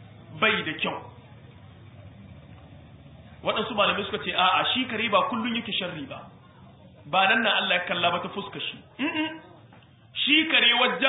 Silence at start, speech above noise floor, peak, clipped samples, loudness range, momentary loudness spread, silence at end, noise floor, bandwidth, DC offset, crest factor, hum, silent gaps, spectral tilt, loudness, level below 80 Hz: 0 s; 27 dB; -6 dBFS; under 0.1%; 6 LU; 15 LU; 0 s; -52 dBFS; 4.1 kHz; under 0.1%; 22 dB; none; none; -8 dB/octave; -24 LUFS; -60 dBFS